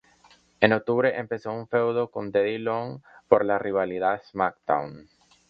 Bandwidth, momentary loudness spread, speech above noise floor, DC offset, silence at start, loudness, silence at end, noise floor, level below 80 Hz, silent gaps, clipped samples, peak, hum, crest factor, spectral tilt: 6.6 kHz; 10 LU; 33 dB; under 0.1%; 0.6 s; -25 LUFS; 0.45 s; -58 dBFS; -64 dBFS; none; under 0.1%; -2 dBFS; none; 24 dB; -7.5 dB/octave